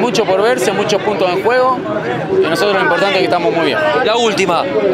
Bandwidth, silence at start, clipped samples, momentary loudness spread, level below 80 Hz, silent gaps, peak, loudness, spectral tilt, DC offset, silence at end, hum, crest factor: 15.5 kHz; 0 s; under 0.1%; 3 LU; -52 dBFS; none; -2 dBFS; -13 LUFS; -4 dB/octave; under 0.1%; 0 s; none; 12 dB